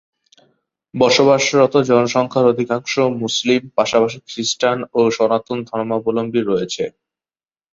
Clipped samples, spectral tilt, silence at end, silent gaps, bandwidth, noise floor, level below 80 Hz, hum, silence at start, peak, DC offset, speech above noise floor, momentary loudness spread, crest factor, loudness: under 0.1%; -4.5 dB/octave; 0.85 s; none; 8 kHz; under -90 dBFS; -60 dBFS; none; 0.95 s; -2 dBFS; under 0.1%; over 74 dB; 10 LU; 16 dB; -17 LUFS